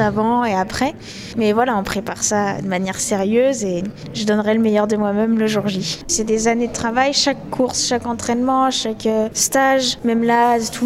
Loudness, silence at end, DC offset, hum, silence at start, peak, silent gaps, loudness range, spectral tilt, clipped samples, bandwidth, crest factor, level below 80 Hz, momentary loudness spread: -18 LUFS; 0 s; under 0.1%; none; 0 s; -2 dBFS; none; 2 LU; -3.5 dB/octave; under 0.1%; 16 kHz; 14 dB; -46 dBFS; 6 LU